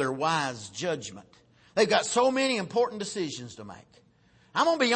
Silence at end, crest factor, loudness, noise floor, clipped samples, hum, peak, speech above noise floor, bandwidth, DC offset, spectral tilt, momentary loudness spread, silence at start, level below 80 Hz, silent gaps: 0 s; 20 dB; -27 LUFS; -62 dBFS; under 0.1%; none; -10 dBFS; 34 dB; 8.8 kHz; under 0.1%; -3.5 dB/octave; 16 LU; 0 s; -70 dBFS; none